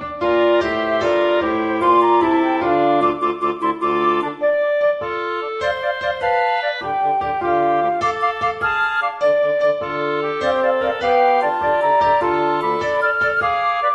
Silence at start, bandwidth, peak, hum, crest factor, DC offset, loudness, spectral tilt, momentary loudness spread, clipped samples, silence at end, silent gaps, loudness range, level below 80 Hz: 0 s; 8.6 kHz; -4 dBFS; none; 14 dB; under 0.1%; -18 LUFS; -5.5 dB/octave; 5 LU; under 0.1%; 0 s; none; 3 LU; -52 dBFS